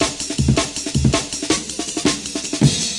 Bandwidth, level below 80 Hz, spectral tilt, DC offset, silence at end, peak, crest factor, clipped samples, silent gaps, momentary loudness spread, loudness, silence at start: 11.5 kHz; -34 dBFS; -4 dB/octave; under 0.1%; 0 s; -2 dBFS; 18 dB; under 0.1%; none; 5 LU; -19 LUFS; 0 s